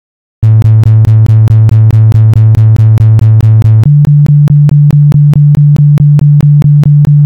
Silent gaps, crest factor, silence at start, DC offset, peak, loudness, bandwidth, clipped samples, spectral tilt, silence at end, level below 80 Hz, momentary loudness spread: none; 4 dB; 0.4 s; 0.7%; 0 dBFS; -5 LUFS; 4.3 kHz; 1%; -10 dB/octave; 0 s; -26 dBFS; 0 LU